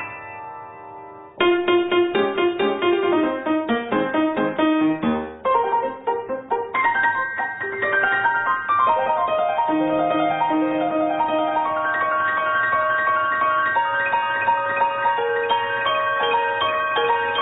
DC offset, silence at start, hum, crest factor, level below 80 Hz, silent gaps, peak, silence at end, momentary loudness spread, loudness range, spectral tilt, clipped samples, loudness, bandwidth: under 0.1%; 0 s; none; 14 dB; -60 dBFS; none; -6 dBFS; 0 s; 6 LU; 2 LU; -9.5 dB/octave; under 0.1%; -20 LUFS; 4 kHz